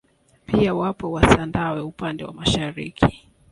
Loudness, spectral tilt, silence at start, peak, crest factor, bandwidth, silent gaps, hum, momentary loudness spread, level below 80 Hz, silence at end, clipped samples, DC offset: -22 LUFS; -5.5 dB/octave; 0.5 s; 0 dBFS; 22 dB; 11.5 kHz; none; none; 12 LU; -36 dBFS; 0.35 s; under 0.1%; under 0.1%